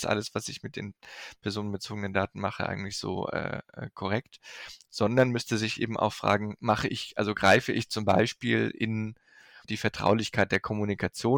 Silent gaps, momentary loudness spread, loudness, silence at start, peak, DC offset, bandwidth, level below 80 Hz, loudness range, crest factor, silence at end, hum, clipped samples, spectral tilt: none; 14 LU; -29 LUFS; 0 s; -10 dBFS; under 0.1%; 18 kHz; -60 dBFS; 7 LU; 18 dB; 0 s; none; under 0.1%; -5 dB/octave